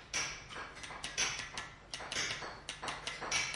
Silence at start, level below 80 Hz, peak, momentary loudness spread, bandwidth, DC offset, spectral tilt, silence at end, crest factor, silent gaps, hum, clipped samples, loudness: 0 s; -62 dBFS; -20 dBFS; 11 LU; 11.5 kHz; under 0.1%; -0.5 dB/octave; 0 s; 22 dB; none; none; under 0.1%; -39 LUFS